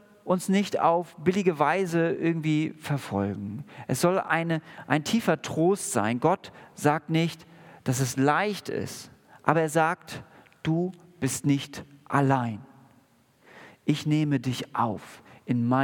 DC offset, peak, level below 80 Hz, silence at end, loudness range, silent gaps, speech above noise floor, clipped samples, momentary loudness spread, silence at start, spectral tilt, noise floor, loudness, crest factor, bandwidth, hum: under 0.1%; -2 dBFS; -68 dBFS; 0 s; 3 LU; none; 36 dB; under 0.1%; 12 LU; 0.25 s; -5.5 dB/octave; -62 dBFS; -27 LUFS; 24 dB; 18 kHz; none